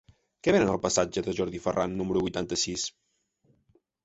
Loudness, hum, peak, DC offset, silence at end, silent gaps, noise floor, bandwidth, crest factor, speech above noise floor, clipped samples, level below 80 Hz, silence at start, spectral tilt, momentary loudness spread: -28 LUFS; none; -10 dBFS; under 0.1%; 1.15 s; none; -69 dBFS; 8.2 kHz; 20 dB; 42 dB; under 0.1%; -54 dBFS; 0.45 s; -4 dB/octave; 7 LU